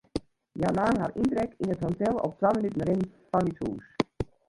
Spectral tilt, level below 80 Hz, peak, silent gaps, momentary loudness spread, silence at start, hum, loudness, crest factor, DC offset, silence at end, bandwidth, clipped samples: -7.5 dB/octave; -52 dBFS; -8 dBFS; none; 9 LU; 0.15 s; none; -29 LUFS; 20 dB; under 0.1%; 0.25 s; 11.5 kHz; under 0.1%